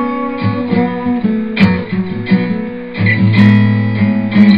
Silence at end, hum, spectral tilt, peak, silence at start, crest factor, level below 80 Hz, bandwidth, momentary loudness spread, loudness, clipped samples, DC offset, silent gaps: 0 s; none; -9.5 dB/octave; 0 dBFS; 0 s; 12 dB; -46 dBFS; 5.4 kHz; 10 LU; -13 LUFS; 0.2%; 1%; none